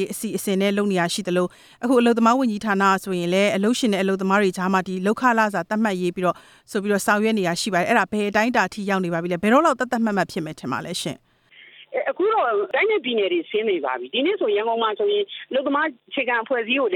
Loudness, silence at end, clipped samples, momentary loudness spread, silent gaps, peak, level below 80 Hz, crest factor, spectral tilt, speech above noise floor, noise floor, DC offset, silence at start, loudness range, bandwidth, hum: -21 LUFS; 0 s; under 0.1%; 8 LU; none; -4 dBFS; -64 dBFS; 16 dB; -5 dB/octave; 29 dB; -50 dBFS; under 0.1%; 0 s; 3 LU; 17.5 kHz; none